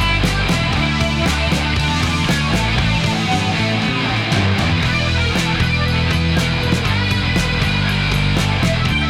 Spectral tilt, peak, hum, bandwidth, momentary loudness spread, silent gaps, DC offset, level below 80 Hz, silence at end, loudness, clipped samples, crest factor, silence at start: -5 dB/octave; -4 dBFS; none; 16 kHz; 1 LU; none; under 0.1%; -26 dBFS; 0 s; -16 LUFS; under 0.1%; 14 dB; 0 s